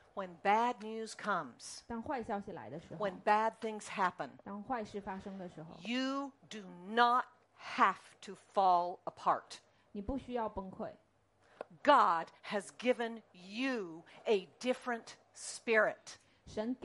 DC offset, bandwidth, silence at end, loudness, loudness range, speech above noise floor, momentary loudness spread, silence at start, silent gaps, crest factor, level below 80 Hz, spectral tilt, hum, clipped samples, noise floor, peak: under 0.1%; 11.5 kHz; 0.1 s; -35 LUFS; 4 LU; 34 dB; 19 LU; 0.15 s; none; 24 dB; -66 dBFS; -4 dB/octave; none; under 0.1%; -70 dBFS; -12 dBFS